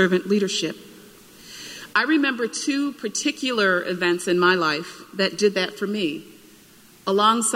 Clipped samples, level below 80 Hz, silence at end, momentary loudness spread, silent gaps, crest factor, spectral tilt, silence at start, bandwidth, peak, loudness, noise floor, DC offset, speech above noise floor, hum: under 0.1%; -68 dBFS; 0 s; 16 LU; none; 18 dB; -3.5 dB/octave; 0 s; 16 kHz; -4 dBFS; -22 LUFS; -50 dBFS; under 0.1%; 29 dB; none